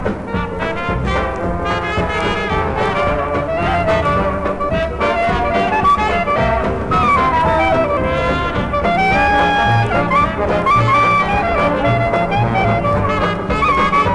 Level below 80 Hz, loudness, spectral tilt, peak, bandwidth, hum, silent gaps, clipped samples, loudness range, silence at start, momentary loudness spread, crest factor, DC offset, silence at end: -28 dBFS; -15 LUFS; -6.5 dB/octave; -4 dBFS; 11 kHz; none; none; under 0.1%; 3 LU; 0 s; 6 LU; 12 dB; under 0.1%; 0 s